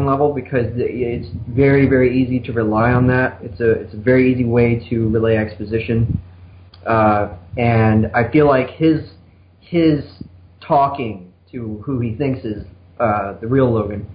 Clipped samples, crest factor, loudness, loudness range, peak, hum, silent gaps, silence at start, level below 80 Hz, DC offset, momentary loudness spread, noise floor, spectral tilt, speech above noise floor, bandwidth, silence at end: under 0.1%; 14 dB; -17 LUFS; 5 LU; -4 dBFS; none; none; 0 s; -36 dBFS; under 0.1%; 12 LU; -47 dBFS; -13 dB/octave; 31 dB; 5.2 kHz; 0 s